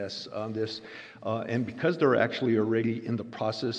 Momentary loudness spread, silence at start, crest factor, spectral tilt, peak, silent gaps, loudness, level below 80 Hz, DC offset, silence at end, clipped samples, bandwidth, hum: 11 LU; 0 s; 20 dB; -6.5 dB/octave; -10 dBFS; none; -29 LUFS; -72 dBFS; under 0.1%; 0 s; under 0.1%; 8.6 kHz; none